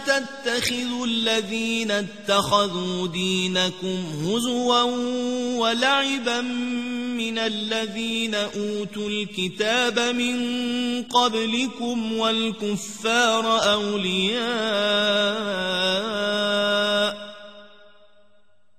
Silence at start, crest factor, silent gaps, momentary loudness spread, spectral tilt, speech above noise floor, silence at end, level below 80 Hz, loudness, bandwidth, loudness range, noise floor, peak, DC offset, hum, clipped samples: 0 s; 18 dB; none; 7 LU; -3.5 dB/octave; 41 dB; 1.1 s; -62 dBFS; -23 LUFS; 14 kHz; 3 LU; -65 dBFS; -6 dBFS; 0.3%; none; under 0.1%